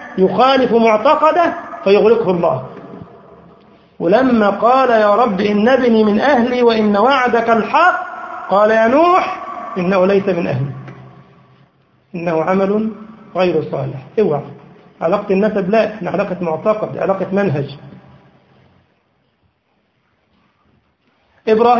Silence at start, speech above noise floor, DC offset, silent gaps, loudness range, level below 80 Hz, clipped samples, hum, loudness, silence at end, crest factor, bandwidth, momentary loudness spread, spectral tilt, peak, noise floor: 0 s; 49 dB; under 0.1%; none; 8 LU; -52 dBFS; under 0.1%; none; -14 LUFS; 0 s; 16 dB; 7.2 kHz; 13 LU; -7.5 dB/octave; 0 dBFS; -62 dBFS